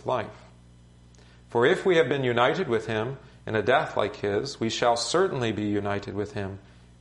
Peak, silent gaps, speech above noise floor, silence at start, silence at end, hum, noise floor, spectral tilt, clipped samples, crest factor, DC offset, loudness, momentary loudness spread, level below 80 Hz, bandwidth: -6 dBFS; none; 27 dB; 0.05 s; 0.4 s; 60 Hz at -55 dBFS; -53 dBFS; -5 dB/octave; under 0.1%; 20 dB; under 0.1%; -26 LUFS; 11 LU; -56 dBFS; 11.5 kHz